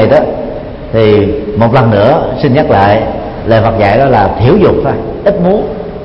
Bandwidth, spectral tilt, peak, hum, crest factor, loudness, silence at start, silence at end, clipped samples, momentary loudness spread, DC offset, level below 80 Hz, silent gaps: 5.8 kHz; -9.5 dB/octave; 0 dBFS; none; 8 dB; -9 LUFS; 0 s; 0 s; 0.4%; 9 LU; under 0.1%; -28 dBFS; none